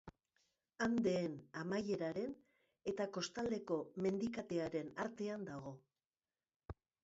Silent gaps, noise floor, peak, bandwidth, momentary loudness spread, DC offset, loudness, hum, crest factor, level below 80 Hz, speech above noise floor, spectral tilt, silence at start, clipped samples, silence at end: 6.06-6.10 s, 6.56-6.60 s; under -90 dBFS; -26 dBFS; 7.6 kHz; 15 LU; under 0.1%; -42 LUFS; none; 18 dB; -72 dBFS; over 49 dB; -5.5 dB/octave; 0.05 s; under 0.1%; 0.3 s